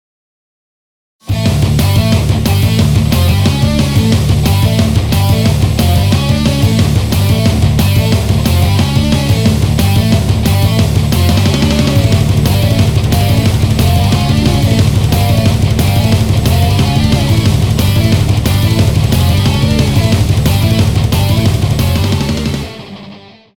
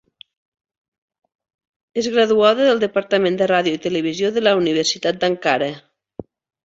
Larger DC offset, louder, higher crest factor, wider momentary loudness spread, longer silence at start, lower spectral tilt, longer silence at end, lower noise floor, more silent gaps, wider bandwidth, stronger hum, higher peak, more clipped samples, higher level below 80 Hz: first, 0.2% vs under 0.1%; first, -11 LUFS vs -18 LUFS; second, 10 dB vs 18 dB; second, 1 LU vs 19 LU; second, 1.25 s vs 1.95 s; first, -6 dB/octave vs -4 dB/octave; about the same, 0.4 s vs 0.45 s; second, -34 dBFS vs -38 dBFS; neither; first, 18 kHz vs 8 kHz; neither; about the same, 0 dBFS vs -2 dBFS; neither; first, -20 dBFS vs -62 dBFS